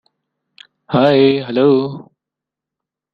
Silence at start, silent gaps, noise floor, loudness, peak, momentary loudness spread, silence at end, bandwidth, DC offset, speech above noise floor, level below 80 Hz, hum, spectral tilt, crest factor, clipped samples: 0.9 s; none; -84 dBFS; -14 LUFS; -2 dBFS; 13 LU; 1.1 s; 5.4 kHz; under 0.1%; 71 dB; -58 dBFS; none; -8.5 dB/octave; 16 dB; under 0.1%